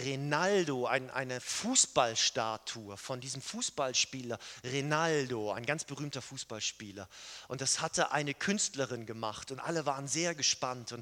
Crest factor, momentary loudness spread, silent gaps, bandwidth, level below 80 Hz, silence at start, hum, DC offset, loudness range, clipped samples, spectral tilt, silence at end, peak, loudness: 24 dB; 13 LU; none; 17.5 kHz; -72 dBFS; 0 s; none; under 0.1%; 4 LU; under 0.1%; -2.5 dB/octave; 0 s; -12 dBFS; -33 LUFS